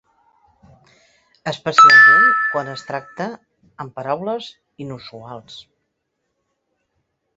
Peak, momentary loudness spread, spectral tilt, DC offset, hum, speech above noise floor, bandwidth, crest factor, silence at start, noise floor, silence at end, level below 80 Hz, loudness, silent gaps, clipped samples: -2 dBFS; 28 LU; -3 dB/octave; under 0.1%; none; 58 dB; 8 kHz; 18 dB; 1.45 s; -74 dBFS; 1.75 s; -64 dBFS; -12 LUFS; none; under 0.1%